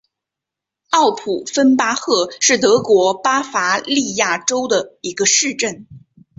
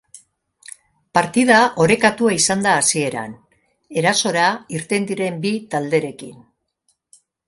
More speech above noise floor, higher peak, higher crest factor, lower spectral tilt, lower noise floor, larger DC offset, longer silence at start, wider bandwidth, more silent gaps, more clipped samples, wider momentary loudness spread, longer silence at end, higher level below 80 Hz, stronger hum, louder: first, 68 dB vs 50 dB; about the same, -2 dBFS vs 0 dBFS; about the same, 16 dB vs 20 dB; second, -2 dB/octave vs -3.5 dB/octave; first, -84 dBFS vs -68 dBFS; neither; first, 0.9 s vs 0.15 s; second, 8.2 kHz vs 11.5 kHz; neither; neither; second, 7 LU vs 19 LU; second, 0.4 s vs 1.1 s; about the same, -62 dBFS vs -58 dBFS; neither; about the same, -16 LUFS vs -17 LUFS